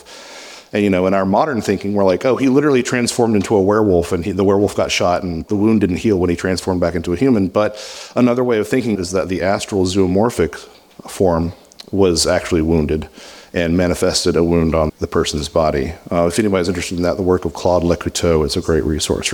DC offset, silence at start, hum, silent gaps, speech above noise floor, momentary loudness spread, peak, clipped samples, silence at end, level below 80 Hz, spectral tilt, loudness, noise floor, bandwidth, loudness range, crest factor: under 0.1%; 0.1 s; none; none; 21 dB; 7 LU; -2 dBFS; under 0.1%; 0 s; -36 dBFS; -5.5 dB/octave; -16 LUFS; -37 dBFS; 18.5 kHz; 3 LU; 14 dB